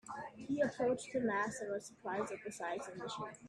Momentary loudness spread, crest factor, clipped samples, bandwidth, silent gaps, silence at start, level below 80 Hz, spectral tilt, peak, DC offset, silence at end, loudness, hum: 9 LU; 16 dB; under 0.1%; 13 kHz; none; 0.05 s; -76 dBFS; -4.5 dB/octave; -24 dBFS; under 0.1%; 0 s; -40 LUFS; none